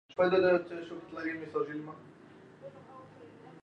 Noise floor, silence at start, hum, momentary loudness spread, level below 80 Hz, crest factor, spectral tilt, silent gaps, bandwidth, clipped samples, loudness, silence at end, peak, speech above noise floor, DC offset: -55 dBFS; 0.1 s; none; 26 LU; -72 dBFS; 18 dB; -7.5 dB/octave; none; 6.8 kHz; under 0.1%; -32 LUFS; 0.05 s; -16 dBFS; 24 dB; under 0.1%